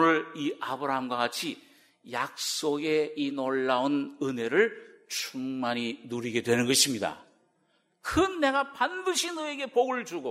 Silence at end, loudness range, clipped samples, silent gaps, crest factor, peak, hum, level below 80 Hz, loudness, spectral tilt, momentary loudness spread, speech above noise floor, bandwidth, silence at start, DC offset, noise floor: 0 s; 2 LU; under 0.1%; none; 20 dB; -10 dBFS; none; -60 dBFS; -29 LUFS; -3 dB/octave; 9 LU; 42 dB; 16 kHz; 0 s; under 0.1%; -71 dBFS